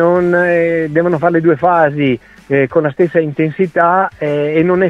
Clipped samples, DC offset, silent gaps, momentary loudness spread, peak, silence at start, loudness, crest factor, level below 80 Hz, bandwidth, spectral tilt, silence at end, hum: under 0.1%; under 0.1%; none; 5 LU; 0 dBFS; 0 s; -13 LUFS; 12 dB; -50 dBFS; 6 kHz; -9 dB/octave; 0 s; none